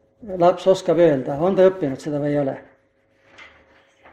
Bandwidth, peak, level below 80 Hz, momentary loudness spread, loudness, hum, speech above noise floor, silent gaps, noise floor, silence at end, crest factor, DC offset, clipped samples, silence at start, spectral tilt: 9.4 kHz; -4 dBFS; -58 dBFS; 10 LU; -19 LUFS; 50 Hz at -55 dBFS; 43 dB; none; -61 dBFS; 0.7 s; 18 dB; under 0.1%; under 0.1%; 0.2 s; -7 dB/octave